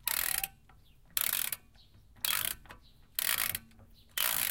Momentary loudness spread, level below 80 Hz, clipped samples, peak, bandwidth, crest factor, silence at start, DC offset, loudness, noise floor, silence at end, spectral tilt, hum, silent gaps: 11 LU; -60 dBFS; under 0.1%; -6 dBFS; 17.5 kHz; 30 dB; 0.05 s; under 0.1%; -32 LUFS; -61 dBFS; 0 s; 1 dB/octave; none; none